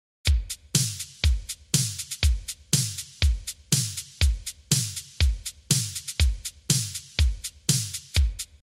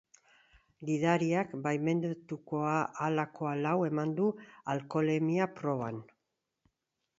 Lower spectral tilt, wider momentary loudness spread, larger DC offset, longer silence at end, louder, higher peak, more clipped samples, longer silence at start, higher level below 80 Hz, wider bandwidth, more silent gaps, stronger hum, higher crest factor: second, -3 dB/octave vs -7 dB/octave; second, 6 LU vs 9 LU; neither; second, 0.35 s vs 1.15 s; first, -26 LUFS vs -33 LUFS; first, -4 dBFS vs -12 dBFS; neither; second, 0.25 s vs 0.8 s; first, -30 dBFS vs -74 dBFS; first, 16 kHz vs 7.8 kHz; neither; neither; about the same, 22 dB vs 20 dB